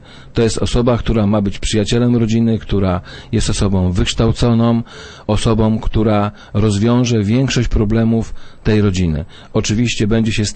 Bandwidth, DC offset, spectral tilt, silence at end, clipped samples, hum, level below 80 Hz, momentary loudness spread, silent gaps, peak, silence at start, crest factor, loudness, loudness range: 8.8 kHz; under 0.1%; -6 dB/octave; 0 s; under 0.1%; none; -26 dBFS; 6 LU; none; -2 dBFS; 0.1 s; 12 dB; -16 LUFS; 1 LU